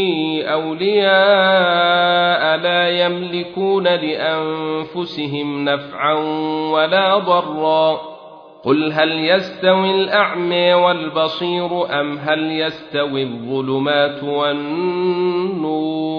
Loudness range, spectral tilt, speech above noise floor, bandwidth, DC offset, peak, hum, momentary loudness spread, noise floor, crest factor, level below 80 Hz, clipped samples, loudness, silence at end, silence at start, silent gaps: 5 LU; -7 dB/octave; 22 dB; 5.4 kHz; under 0.1%; -2 dBFS; none; 9 LU; -39 dBFS; 16 dB; -62 dBFS; under 0.1%; -17 LUFS; 0 s; 0 s; none